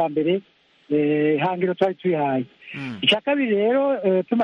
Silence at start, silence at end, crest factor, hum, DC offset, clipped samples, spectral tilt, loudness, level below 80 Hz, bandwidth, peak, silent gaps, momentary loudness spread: 0 s; 0 s; 16 dB; none; under 0.1%; under 0.1%; -6.5 dB/octave; -21 LUFS; -68 dBFS; 9.4 kHz; -4 dBFS; none; 8 LU